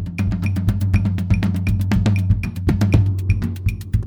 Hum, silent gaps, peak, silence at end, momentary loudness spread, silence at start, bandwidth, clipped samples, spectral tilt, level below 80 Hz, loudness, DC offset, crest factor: none; none; -2 dBFS; 0 s; 5 LU; 0 s; 15 kHz; under 0.1%; -8 dB/octave; -28 dBFS; -19 LUFS; under 0.1%; 16 dB